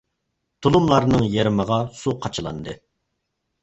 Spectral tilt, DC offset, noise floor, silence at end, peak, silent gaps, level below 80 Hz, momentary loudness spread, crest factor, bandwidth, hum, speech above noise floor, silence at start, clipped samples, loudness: -6.5 dB/octave; under 0.1%; -76 dBFS; 0.9 s; -4 dBFS; none; -44 dBFS; 16 LU; 18 dB; 8.2 kHz; none; 56 dB; 0.6 s; under 0.1%; -20 LUFS